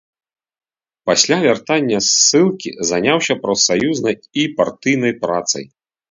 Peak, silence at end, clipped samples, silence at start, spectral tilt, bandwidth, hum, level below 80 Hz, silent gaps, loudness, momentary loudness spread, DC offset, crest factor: 0 dBFS; 0.45 s; under 0.1%; 1.05 s; -2.5 dB/octave; 7.8 kHz; none; -58 dBFS; none; -15 LUFS; 9 LU; under 0.1%; 18 dB